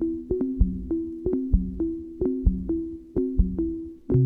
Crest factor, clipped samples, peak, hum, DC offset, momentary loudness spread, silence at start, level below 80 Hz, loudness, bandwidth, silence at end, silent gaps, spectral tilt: 18 dB; under 0.1%; -6 dBFS; none; under 0.1%; 5 LU; 0 s; -30 dBFS; -28 LUFS; 1.7 kHz; 0 s; none; -13.5 dB/octave